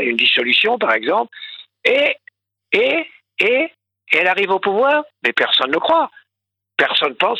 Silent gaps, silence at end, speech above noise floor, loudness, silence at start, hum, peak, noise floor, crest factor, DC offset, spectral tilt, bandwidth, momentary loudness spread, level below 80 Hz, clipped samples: none; 0 s; 65 dB; -16 LUFS; 0 s; none; 0 dBFS; -82 dBFS; 18 dB; under 0.1%; -4 dB/octave; 12 kHz; 11 LU; -68 dBFS; under 0.1%